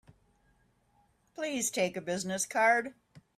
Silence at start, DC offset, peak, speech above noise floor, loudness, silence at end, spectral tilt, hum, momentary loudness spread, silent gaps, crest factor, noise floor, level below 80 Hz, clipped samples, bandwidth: 1.4 s; under 0.1%; -14 dBFS; 39 dB; -30 LUFS; 0.2 s; -2.5 dB/octave; none; 14 LU; none; 20 dB; -70 dBFS; -74 dBFS; under 0.1%; 16 kHz